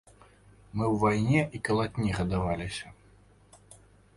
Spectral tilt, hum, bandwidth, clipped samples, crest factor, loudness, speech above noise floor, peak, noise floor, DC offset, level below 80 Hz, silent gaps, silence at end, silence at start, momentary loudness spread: -6.5 dB/octave; none; 11.5 kHz; under 0.1%; 18 dB; -29 LUFS; 31 dB; -12 dBFS; -58 dBFS; under 0.1%; -48 dBFS; none; 0.4 s; 0.75 s; 13 LU